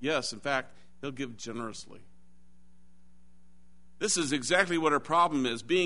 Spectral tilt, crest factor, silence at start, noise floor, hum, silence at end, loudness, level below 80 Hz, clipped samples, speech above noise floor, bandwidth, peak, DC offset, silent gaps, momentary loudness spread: -3 dB/octave; 22 dB; 0 s; -63 dBFS; none; 0 s; -29 LUFS; -64 dBFS; under 0.1%; 33 dB; 11 kHz; -10 dBFS; 0.5%; none; 16 LU